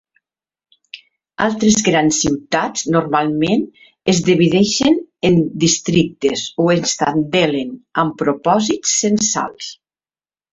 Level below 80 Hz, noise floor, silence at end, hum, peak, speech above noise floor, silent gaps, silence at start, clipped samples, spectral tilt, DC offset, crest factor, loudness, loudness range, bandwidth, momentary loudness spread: -50 dBFS; under -90 dBFS; 0.8 s; none; -2 dBFS; over 74 dB; none; 0.95 s; under 0.1%; -4 dB/octave; under 0.1%; 16 dB; -16 LUFS; 2 LU; 8.2 kHz; 7 LU